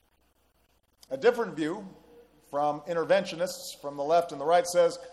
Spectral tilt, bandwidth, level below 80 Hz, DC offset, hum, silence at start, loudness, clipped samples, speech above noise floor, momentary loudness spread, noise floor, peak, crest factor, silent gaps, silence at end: -4 dB/octave; 13.5 kHz; -70 dBFS; under 0.1%; none; 1.1 s; -28 LUFS; under 0.1%; 42 dB; 12 LU; -69 dBFS; -10 dBFS; 20 dB; none; 0 s